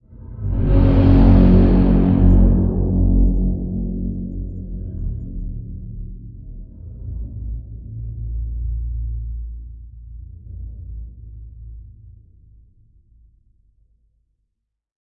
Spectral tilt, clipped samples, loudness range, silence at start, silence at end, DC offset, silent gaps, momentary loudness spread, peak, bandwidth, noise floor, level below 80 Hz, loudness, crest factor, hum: -12 dB/octave; under 0.1%; 24 LU; 0.1 s; 2.95 s; under 0.1%; none; 26 LU; -2 dBFS; 4.5 kHz; -75 dBFS; -22 dBFS; -18 LUFS; 18 dB; none